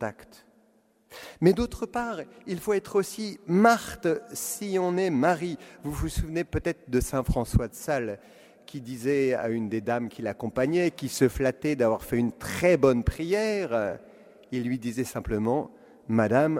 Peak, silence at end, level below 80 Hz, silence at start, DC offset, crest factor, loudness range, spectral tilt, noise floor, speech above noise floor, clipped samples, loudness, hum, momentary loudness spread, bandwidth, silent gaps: -6 dBFS; 0 s; -42 dBFS; 0 s; under 0.1%; 20 dB; 4 LU; -6 dB/octave; -64 dBFS; 38 dB; under 0.1%; -27 LUFS; none; 13 LU; 16 kHz; none